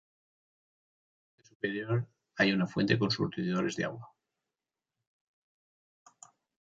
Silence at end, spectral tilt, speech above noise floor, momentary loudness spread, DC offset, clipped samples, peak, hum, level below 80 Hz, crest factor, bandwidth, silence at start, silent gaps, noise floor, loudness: 2.6 s; -6 dB/octave; over 59 dB; 10 LU; under 0.1%; under 0.1%; -10 dBFS; none; -72 dBFS; 24 dB; 7.8 kHz; 1.65 s; none; under -90 dBFS; -31 LUFS